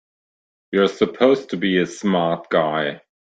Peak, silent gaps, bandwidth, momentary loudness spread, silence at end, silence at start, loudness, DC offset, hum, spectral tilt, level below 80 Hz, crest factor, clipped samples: -2 dBFS; none; 9 kHz; 6 LU; 0.25 s; 0.7 s; -20 LUFS; under 0.1%; none; -6 dB/octave; -62 dBFS; 18 dB; under 0.1%